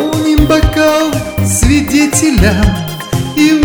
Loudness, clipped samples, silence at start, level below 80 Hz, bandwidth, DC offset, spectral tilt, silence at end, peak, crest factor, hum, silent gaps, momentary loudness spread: -11 LUFS; 0.6%; 0 s; -18 dBFS; over 20 kHz; 0.5%; -5 dB/octave; 0 s; 0 dBFS; 10 dB; none; none; 6 LU